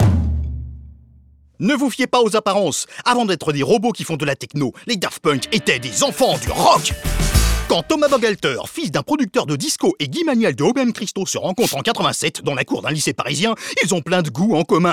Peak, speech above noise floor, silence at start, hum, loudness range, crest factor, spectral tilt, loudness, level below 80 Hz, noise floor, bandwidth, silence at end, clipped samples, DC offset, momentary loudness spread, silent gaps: 0 dBFS; 31 dB; 0 s; none; 2 LU; 18 dB; -4.5 dB/octave; -18 LUFS; -30 dBFS; -49 dBFS; 17.5 kHz; 0 s; under 0.1%; under 0.1%; 6 LU; none